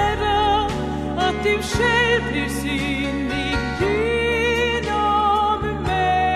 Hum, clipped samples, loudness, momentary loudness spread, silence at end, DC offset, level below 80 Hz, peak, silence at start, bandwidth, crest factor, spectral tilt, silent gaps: none; under 0.1%; -20 LUFS; 5 LU; 0 s; under 0.1%; -34 dBFS; -8 dBFS; 0 s; 14 kHz; 12 dB; -5 dB/octave; none